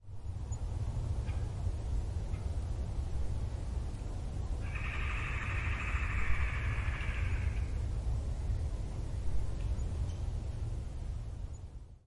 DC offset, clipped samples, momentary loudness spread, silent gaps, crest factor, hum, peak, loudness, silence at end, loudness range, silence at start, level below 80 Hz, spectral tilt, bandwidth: under 0.1%; under 0.1%; 7 LU; none; 18 dB; none; -18 dBFS; -38 LUFS; 0.1 s; 3 LU; 0 s; -38 dBFS; -6 dB/octave; 11 kHz